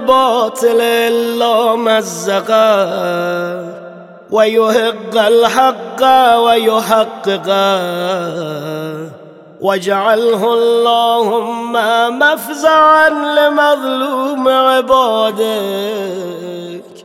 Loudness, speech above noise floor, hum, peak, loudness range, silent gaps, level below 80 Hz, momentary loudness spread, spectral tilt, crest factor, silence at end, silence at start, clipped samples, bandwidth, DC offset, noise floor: -12 LUFS; 21 dB; none; 0 dBFS; 4 LU; none; -58 dBFS; 12 LU; -3.5 dB/octave; 12 dB; 0.05 s; 0 s; under 0.1%; 16.5 kHz; under 0.1%; -33 dBFS